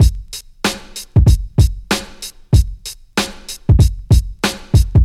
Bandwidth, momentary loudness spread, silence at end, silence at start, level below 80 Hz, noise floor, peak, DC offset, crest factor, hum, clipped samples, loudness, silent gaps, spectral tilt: 15.5 kHz; 15 LU; 0 s; 0 s; -18 dBFS; -33 dBFS; -2 dBFS; under 0.1%; 14 dB; none; under 0.1%; -16 LUFS; none; -5.5 dB/octave